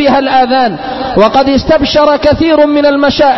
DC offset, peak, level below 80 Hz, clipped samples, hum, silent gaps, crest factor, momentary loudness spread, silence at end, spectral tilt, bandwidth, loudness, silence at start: 1%; 0 dBFS; -30 dBFS; 0.2%; none; none; 8 dB; 4 LU; 0 s; -6 dB/octave; 6.2 kHz; -8 LUFS; 0 s